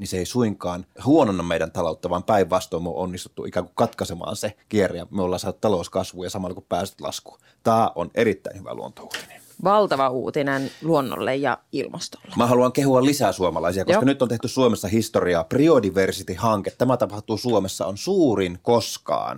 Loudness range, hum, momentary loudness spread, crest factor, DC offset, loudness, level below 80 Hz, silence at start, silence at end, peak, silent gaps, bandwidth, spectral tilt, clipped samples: 5 LU; none; 12 LU; 18 dB; under 0.1%; -22 LUFS; -54 dBFS; 0 s; 0 s; -4 dBFS; none; 17 kHz; -5.5 dB/octave; under 0.1%